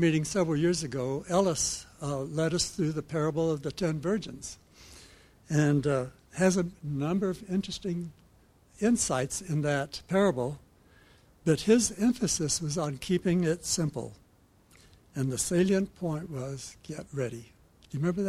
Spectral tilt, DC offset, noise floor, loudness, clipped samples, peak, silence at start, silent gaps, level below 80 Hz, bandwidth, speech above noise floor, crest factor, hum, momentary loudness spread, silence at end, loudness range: -5 dB/octave; under 0.1%; -62 dBFS; -29 LUFS; under 0.1%; -10 dBFS; 0 s; none; -56 dBFS; 14.5 kHz; 33 dB; 20 dB; none; 13 LU; 0 s; 4 LU